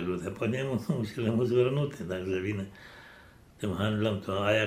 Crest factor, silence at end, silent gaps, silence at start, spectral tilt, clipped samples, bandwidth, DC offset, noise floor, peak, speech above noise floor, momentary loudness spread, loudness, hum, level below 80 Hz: 18 dB; 0 s; none; 0 s; -7 dB/octave; under 0.1%; 15 kHz; under 0.1%; -54 dBFS; -12 dBFS; 25 dB; 12 LU; -30 LUFS; none; -60 dBFS